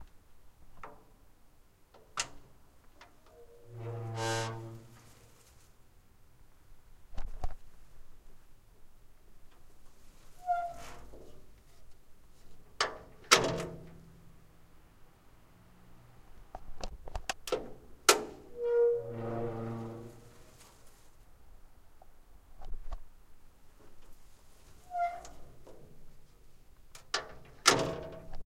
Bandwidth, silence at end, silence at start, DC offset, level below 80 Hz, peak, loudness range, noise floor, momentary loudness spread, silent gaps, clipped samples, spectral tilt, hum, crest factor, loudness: 16 kHz; 0.05 s; 0 s; under 0.1%; -50 dBFS; -6 dBFS; 22 LU; -60 dBFS; 30 LU; none; under 0.1%; -2.5 dB/octave; none; 32 dB; -33 LUFS